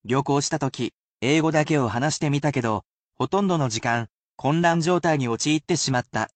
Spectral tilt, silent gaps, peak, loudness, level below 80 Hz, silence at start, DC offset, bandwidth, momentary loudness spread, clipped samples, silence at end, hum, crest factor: -5 dB/octave; 0.95-1.18 s, 2.86-3.09 s, 4.13-4.38 s; -8 dBFS; -23 LUFS; -58 dBFS; 0.05 s; under 0.1%; 9 kHz; 8 LU; under 0.1%; 0.1 s; none; 16 dB